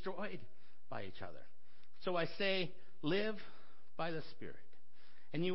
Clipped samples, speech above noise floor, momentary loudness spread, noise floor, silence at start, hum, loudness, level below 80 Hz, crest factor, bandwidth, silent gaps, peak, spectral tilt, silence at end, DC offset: under 0.1%; 28 dB; 18 LU; -70 dBFS; 0 s; none; -41 LUFS; -76 dBFS; 20 dB; 5.8 kHz; none; -26 dBFS; -3.5 dB/octave; 0 s; 1%